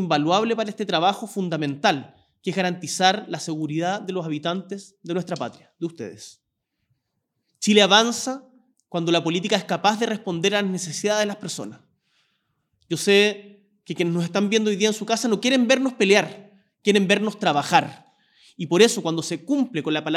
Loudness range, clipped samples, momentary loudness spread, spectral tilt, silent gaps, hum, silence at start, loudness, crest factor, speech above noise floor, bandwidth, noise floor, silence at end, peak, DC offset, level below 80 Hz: 6 LU; under 0.1%; 15 LU; -4 dB/octave; none; none; 0 s; -22 LUFS; 22 dB; 56 dB; 15 kHz; -78 dBFS; 0 s; 0 dBFS; under 0.1%; -80 dBFS